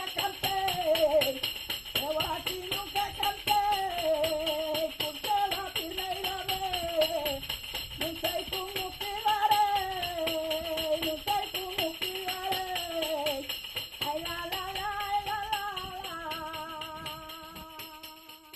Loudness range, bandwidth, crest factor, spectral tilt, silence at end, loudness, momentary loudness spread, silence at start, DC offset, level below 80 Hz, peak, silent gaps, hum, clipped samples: 4 LU; 13.5 kHz; 20 dB; -2.5 dB/octave; 0 s; -31 LUFS; 11 LU; 0 s; under 0.1%; -54 dBFS; -12 dBFS; none; none; under 0.1%